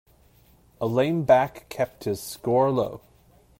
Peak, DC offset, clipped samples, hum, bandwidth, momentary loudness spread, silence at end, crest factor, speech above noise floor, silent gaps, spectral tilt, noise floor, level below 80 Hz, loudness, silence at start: -6 dBFS; under 0.1%; under 0.1%; none; 16 kHz; 11 LU; 0.6 s; 20 dB; 34 dB; none; -6.5 dB/octave; -57 dBFS; -58 dBFS; -24 LUFS; 0.8 s